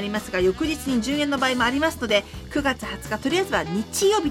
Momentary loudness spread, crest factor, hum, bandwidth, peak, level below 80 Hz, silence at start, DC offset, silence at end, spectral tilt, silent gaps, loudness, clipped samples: 6 LU; 16 dB; none; 17 kHz; -6 dBFS; -44 dBFS; 0 s; under 0.1%; 0 s; -3.5 dB/octave; none; -23 LUFS; under 0.1%